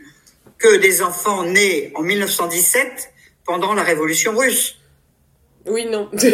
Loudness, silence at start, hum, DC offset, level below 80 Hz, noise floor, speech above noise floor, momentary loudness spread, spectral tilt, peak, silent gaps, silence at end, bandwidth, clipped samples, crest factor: -16 LUFS; 0.6 s; none; under 0.1%; -60 dBFS; -58 dBFS; 41 dB; 11 LU; -2 dB/octave; 0 dBFS; none; 0 s; 16 kHz; under 0.1%; 18 dB